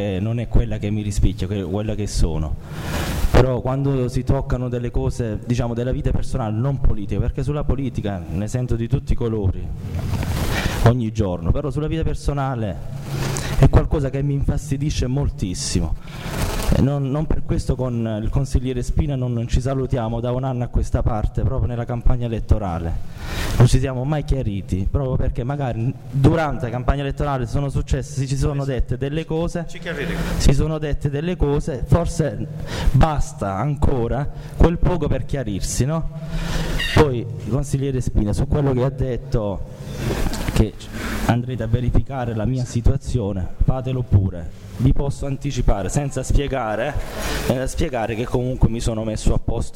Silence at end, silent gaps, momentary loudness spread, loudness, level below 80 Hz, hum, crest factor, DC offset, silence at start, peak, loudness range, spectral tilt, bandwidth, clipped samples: 0 s; none; 8 LU; -22 LUFS; -24 dBFS; none; 18 dB; under 0.1%; 0 s; -2 dBFS; 2 LU; -6.5 dB/octave; 16.5 kHz; under 0.1%